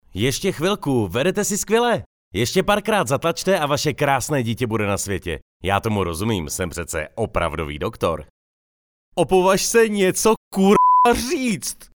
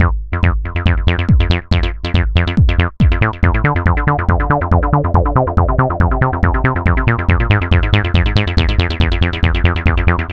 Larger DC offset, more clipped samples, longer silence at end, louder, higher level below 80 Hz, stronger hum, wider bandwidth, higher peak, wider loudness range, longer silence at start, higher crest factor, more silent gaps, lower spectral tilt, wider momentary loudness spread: second, under 0.1% vs 0.7%; neither; about the same, 0.1 s vs 0 s; second, -20 LUFS vs -15 LUFS; second, -42 dBFS vs -18 dBFS; neither; first, over 20 kHz vs 6 kHz; about the same, -2 dBFS vs 0 dBFS; first, 6 LU vs 1 LU; first, 0.15 s vs 0 s; first, 18 dB vs 12 dB; first, 2.06-2.31 s, 5.42-5.60 s, 8.30-9.12 s, 10.37-10.51 s vs none; second, -4.5 dB/octave vs -8 dB/octave; first, 10 LU vs 3 LU